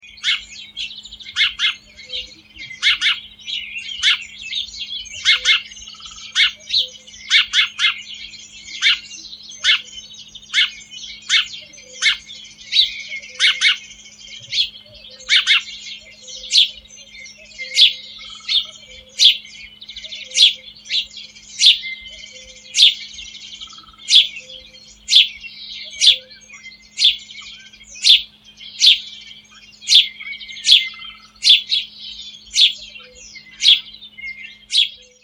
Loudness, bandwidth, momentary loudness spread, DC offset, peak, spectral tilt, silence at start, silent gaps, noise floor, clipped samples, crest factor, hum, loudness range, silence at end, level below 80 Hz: -15 LUFS; over 20 kHz; 23 LU; under 0.1%; 0 dBFS; 3.5 dB/octave; 0.25 s; none; -44 dBFS; under 0.1%; 20 dB; none; 4 LU; 0.3 s; -56 dBFS